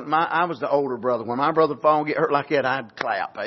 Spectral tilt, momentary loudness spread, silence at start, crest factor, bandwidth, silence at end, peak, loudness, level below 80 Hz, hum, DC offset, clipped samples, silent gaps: -7 dB/octave; 6 LU; 0 s; 18 dB; 6.2 kHz; 0 s; -4 dBFS; -22 LUFS; -70 dBFS; none; under 0.1%; under 0.1%; none